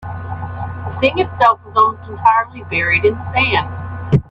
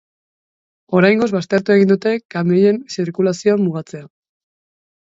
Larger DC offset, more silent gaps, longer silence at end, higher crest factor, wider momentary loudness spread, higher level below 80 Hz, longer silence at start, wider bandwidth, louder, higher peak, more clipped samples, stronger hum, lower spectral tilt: neither; second, none vs 2.25-2.29 s; second, 0.1 s vs 1 s; about the same, 16 dB vs 16 dB; first, 13 LU vs 10 LU; first, -42 dBFS vs -62 dBFS; second, 0 s vs 0.9 s; about the same, 7.4 kHz vs 8 kHz; about the same, -16 LUFS vs -16 LUFS; about the same, 0 dBFS vs 0 dBFS; neither; neither; about the same, -7.5 dB/octave vs -7 dB/octave